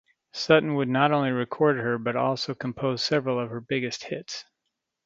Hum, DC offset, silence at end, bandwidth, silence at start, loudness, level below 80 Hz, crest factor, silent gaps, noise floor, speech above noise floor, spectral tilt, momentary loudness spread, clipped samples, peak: none; under 0.1%; 0.65 s; 7.8 kHz; 0.35 s; -25 LUFS; -64 dBFS; 22 dB; none; -82 dBFS; 56 dB; -5.5 dB/octave; 12 LU; under 0.1%; -4 dBFS